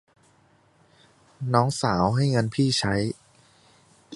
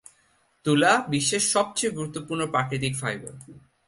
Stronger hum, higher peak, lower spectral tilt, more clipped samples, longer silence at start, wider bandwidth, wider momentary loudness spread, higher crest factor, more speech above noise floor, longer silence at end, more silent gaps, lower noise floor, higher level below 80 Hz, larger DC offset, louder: neither; first, -2 dBFS vs -8 dBFS; first, -5.5 dB/octave vs -3.5 dB/octave; neither; first, 1.4 s vs 0.65 s; about the same, 11.5 kHz vs 11.5 kHz; second, 9 LU vs 12 LU; first, 24 dB vs 18 dB; about the same, 38 dB vs 40 dB; second, 0 s vs 0.3 s; neither; second, -61 dBFS vs -65 dBFS; first, -52 dBFS vs -62 dBFS; neither; about the same, -24 LUFS vs -24 LUFS